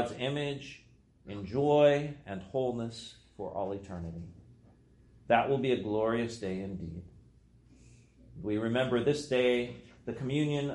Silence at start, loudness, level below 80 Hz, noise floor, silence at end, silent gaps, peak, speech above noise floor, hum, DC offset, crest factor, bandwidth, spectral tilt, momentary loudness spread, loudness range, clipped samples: 0 s; -32 LUFS; -60 dBFS; -60 dBFS; 0 s; none; -10 dBFS; 29 dB; none; under 0.1%; 22 dB; 11.5 kHz; -6.5 dB/octave; 18 LU; 4 LU; under 0.1%